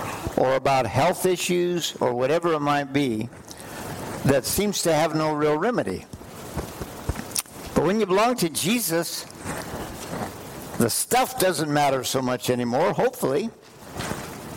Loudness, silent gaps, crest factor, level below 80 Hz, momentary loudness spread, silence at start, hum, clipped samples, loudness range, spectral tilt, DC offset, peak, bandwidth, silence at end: -24 LUFS; none; 16 dB; -48 dBFS; 13 LU; 0 s; none; under 0.1%; 2 LU; -4 dB/octave; under 0.1%; -8 dBFS; 17 kHz; 0 s